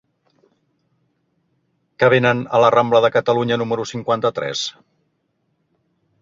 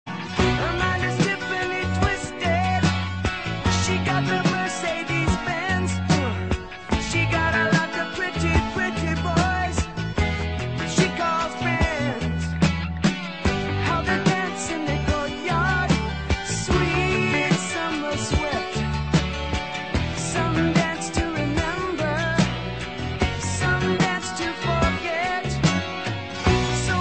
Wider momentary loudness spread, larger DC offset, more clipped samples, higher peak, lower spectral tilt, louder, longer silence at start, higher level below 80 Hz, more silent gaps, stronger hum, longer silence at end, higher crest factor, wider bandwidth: first, 9 LU vs 5 LU; second, under 0.1% vs 0.4%; neither; first, 0 dBFS vs -6 dBFS; about the same, -5 dB/octave vs -5 dB/octave; first, -17 LUFS vs -23 LUFS; first, 2 s vs 0.05 s; second, -60 dBFS vs -34 dBFS; neither; neither; first, 1.5 s vs 0 s; about the same, 20 dB vs 18 dB; second, 7.8 kHz vs 8.8 kHz